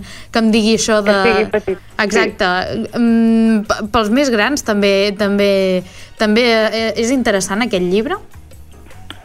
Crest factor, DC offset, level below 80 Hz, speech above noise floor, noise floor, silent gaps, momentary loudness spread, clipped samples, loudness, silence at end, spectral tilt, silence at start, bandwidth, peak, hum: 14 dB; under 0.1%; -40 dBFS; 22 dB; -36 dBFS; none; 7 LU; under 0.1%; -14 LUFS; 0.05 s; -4.5 dB/octave; 0 s; 14 kHz; -2 dBFS; none